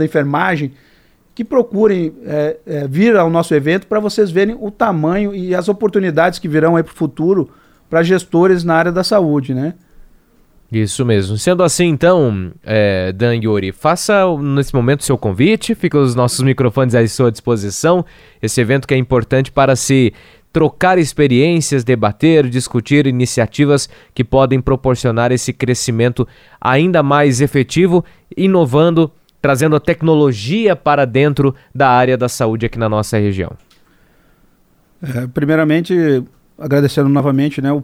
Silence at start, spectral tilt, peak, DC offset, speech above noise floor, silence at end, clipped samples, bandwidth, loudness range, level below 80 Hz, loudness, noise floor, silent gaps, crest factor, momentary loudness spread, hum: 0 s; -6 dB/octave; 0 dBFS; under 0.1%; 40 dB; 0 s; under 0.1%; 16 kHz; 3 LU; -40 dBFS; -14 LUFS; -53 dBFS; none; 14 dB; 7 LU; none